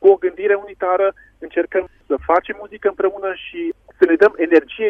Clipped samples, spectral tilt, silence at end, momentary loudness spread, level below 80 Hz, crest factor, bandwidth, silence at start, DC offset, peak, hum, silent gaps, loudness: under 0.1%; -6.5 dB/octave; 0 s; 13 LU; -52 dBFS; 16 dB; 5.2 kHz; 0 s; under 0.1%; 0 dBFS; none; none; -18 LUFS